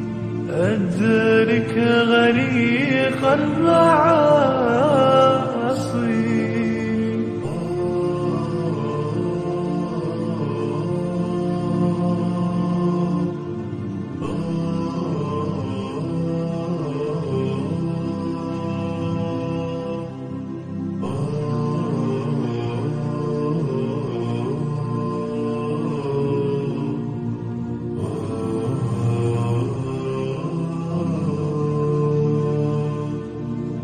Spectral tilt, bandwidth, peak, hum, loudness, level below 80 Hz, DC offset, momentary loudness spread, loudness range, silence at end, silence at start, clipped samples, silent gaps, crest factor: -7.5 dB/octave; 9.8 kHz; -2 dBFS; none; -22 LUFS; -50 dBFS; under 0.1%; 11 LU; 8 LU; 0 s; 0 s; under 0.1%; none; 18 dB